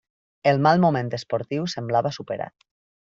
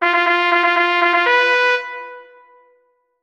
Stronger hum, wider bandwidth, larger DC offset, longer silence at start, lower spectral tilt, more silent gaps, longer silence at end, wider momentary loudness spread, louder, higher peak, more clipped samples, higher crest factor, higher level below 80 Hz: neither; second, 7.6 kHz vs 8.8 kHz; neither; first, 0.45 s vs 0 s; first, -6.5 dB/octave vs -1 dB/octave; neither; second, 0.5 s vs 1 s; second, 13 LU vs 16 LU; second, -23 LUFS vs -14 LUFS; about the same, -4 dBFS vs -2 dBFS; neither; about the same, 20 dB vs 16 dB; first, -62 dBFS vs -68 dBFS